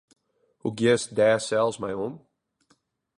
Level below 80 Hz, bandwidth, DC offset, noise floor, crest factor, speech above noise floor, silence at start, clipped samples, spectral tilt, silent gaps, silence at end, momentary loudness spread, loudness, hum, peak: -66 dBFS; 11.5 kHz; under 0.1%; -68 dBFS; 18 dB; 44 dB; 0.65 s; under 0.1%; -4.5 dB/octave; none; 1.05 s; 12 LU; -25 LUFS; none; -8 dBFS